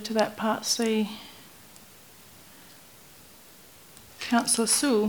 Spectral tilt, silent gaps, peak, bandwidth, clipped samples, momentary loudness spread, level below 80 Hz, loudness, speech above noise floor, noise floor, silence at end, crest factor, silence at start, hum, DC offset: -2.5 dB/octave; none; -6 dBFS; over 20 kHz; under 0.1%; 27 LU; -68 dBFS; -25 LUFS; 27 dB; -52 dBFS; 0 s; 24 dB; 0 s; none; under 0.1%